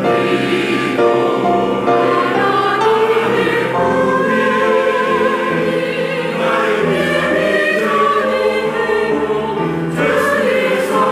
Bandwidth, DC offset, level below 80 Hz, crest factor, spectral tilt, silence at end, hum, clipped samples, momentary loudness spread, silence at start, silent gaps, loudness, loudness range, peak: 15.5 kHz; under 0.1%; -52 dBFS; 12 dB; -5.5 dB/octave; 0 s; none; under 0.1%; 3 LU; 0 s; none; -14 LUFS; 1 LU; -4 dBFS